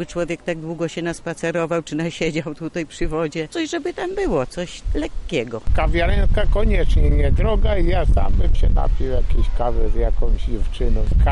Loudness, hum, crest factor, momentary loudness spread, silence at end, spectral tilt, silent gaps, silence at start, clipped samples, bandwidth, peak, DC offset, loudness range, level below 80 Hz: -22 LUFS; none; 8 dB; 7 LU; 0 s; -6.5 dB/octave; none; 0 s; under 0.1%; 10.5 kHz; -8 dBFS; under 0.1%; 4 LU; -20 dBFS